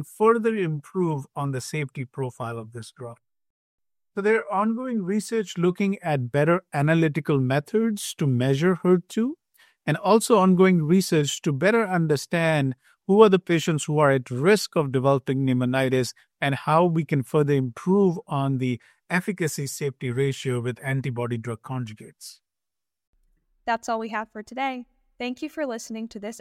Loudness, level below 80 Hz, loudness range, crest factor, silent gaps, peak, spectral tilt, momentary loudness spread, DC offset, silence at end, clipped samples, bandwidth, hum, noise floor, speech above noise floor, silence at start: -24 LUFS; -66 dBFS; 11 LU; 22 dB; 3.50-3.78 s, 23.07-23.13 s; -2 dBFS; -6 dB/octave; 13 LU; under 0.1%; 0 s; under 0.1%; 15 kHz; none; -89 dBFS; 66 dB; 0 s